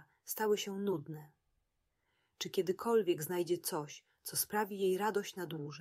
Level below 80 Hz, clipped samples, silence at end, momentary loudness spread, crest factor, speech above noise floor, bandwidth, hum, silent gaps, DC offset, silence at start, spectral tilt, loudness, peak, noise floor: -82 dBFS; under 0.1%; 0 s; 11 LU; 18 dB; 46 dB; 16 kHz; none; none; under 0.1%; 0.25 s; -4 dB/octave; -36 LUFS; -20 dBFS; -82 dBFS